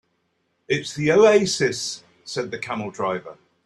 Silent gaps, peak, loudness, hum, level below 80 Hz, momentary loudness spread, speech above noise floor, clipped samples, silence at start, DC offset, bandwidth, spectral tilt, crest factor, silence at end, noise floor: none; -4 dBFS; -22 LUFS; none; -62 dBFS; 15 LU; 49 dB; under 0.1%; 0.7 s; under 0.1%; 12.5 kHz; -4 dB/octave; 20 dB; 0.3 s; -70 dBFS